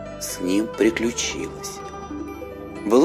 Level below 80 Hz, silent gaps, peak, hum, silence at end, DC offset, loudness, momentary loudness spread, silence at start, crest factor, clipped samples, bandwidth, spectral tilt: -46 dBFS; none; -4 dBFS; none; 0 s; under 0.1%; -25 LUFS; 14 LU; 0 s; 18 dB; under 0.1%; 15.5 kHz; -4 dB/octave